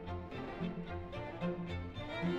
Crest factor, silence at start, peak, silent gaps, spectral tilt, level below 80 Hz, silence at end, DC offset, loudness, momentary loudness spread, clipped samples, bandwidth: 14 dB; 0 s; -26 dBFS; none; -8 dB/octave; -54 dBFS; 0 s; under 0.1%; -42 LUFS; 5 LU; under 0.1%; 7.8 kHz